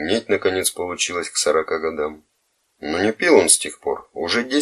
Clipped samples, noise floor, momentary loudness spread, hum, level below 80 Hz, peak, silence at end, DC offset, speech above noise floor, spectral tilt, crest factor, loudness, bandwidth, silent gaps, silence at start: under 0.1%; -67 dBFS; 12 LU; none; -56 dBFS; 0 dBFS; 0 s; under 0.1%; 47 dB; -2 dB/octave; 20 dB; -19 LUFS; 14.5 kHz; none; 0 s